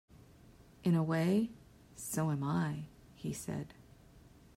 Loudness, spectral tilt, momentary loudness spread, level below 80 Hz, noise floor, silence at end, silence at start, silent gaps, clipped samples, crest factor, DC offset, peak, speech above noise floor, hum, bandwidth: -36 LUFS; -6.5 dB/octave; 15 LU; -66 dBFS; -60 dBFS; 0.35 s; 0.6 s; none; under 0.1%; 16 dB; under 0.1%; -20 dBFS; 26 dB; none; 16 kHz